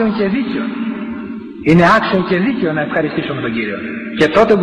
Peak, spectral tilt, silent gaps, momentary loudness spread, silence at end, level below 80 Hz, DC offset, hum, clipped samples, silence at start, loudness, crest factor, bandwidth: 0 dBFS; -7 dB/octave; none; 13 LU; 0 s; -44 dBFS; under 0.1%; none; under 0.1%; 0 s; -15 LUFS; 14 dB; 9.8 kHz